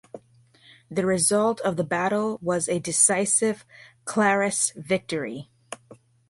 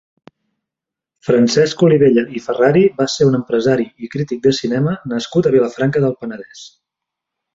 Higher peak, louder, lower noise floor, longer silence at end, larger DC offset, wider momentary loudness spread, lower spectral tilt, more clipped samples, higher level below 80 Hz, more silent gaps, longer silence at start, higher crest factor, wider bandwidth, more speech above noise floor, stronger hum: about the same, -4 dBFS vs -2 dBFS; second, -23 LUFS vs -15 LUFS; second, -57 dBFS vs -85 dBFS; second, 0.35 s vs 0.9 s; neither; first, 19 LU vs 12 LU; second, -3.5 dB/octave vs -6 dB/octave; neither; second, -64 dBFS vs -54 dBFS; neither; second, 0.15 s vs 1.25 s; first, 20 dB vs 14 dB; first, 12 kHz vs 7.8 kHz; second, 33 dB vs 70 dB; neither